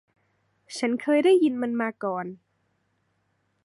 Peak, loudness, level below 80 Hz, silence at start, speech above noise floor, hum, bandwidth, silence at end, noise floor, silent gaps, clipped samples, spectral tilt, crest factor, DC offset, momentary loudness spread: -10 dBFS; -24 LUFS; -82 dBFS; 0.7 s; 48 dB; none; 11.5 kHz; 1.3 s; -72 dBFS; none; under 0.1%; -5 dB/octave; 16 dB; under 0.1%; 15 LU